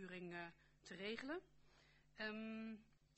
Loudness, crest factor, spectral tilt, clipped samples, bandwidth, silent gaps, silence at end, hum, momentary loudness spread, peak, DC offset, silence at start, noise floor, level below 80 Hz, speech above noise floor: -52 LUFS; 20 dB; -5 dB/octave; under 0.1%; 8.2 kHz; none; 0.2 s; none; 12 LU; -34 dBFS; under 0.1%; 0 s; -72 dBFS; -80 dBFS; 21 dB